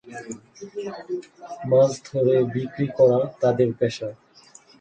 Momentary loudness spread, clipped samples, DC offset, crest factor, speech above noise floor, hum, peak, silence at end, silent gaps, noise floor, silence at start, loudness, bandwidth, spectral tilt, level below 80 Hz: 18 LU; under 0.1%; under 0.1%; 18 dB; 29 dB; none; -6 dBFS; 0.65 s; none; -51 dBFS; 0.05 s; -22 LUFS; 9 kHz; -7 dB/octave; -62 dBFS